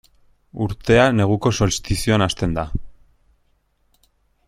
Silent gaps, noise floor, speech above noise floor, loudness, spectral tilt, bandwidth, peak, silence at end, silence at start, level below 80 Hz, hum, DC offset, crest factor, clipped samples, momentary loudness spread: none; -63 dBFS; 45 dB; -19 LUFS; -5.5 dB/octave; 14.5 kHz; -2 dBFS; 1.55 s; 0.55 s; -36 dBFS; none; under 0.1%; 20 dB; under 0.1%; 13 LU